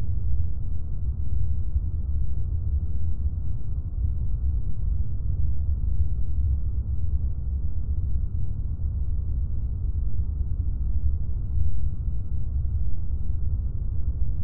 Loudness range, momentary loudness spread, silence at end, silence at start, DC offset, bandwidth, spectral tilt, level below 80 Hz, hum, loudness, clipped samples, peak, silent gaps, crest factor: 1 LU; 3 LU; 0 s; 0 s; under 0.1%; 1.4 kHz; -15.5 dB/octave; -28 dBFS; none; -30 LUFS; under 0.1%; -10 dBFS; none; 12 dB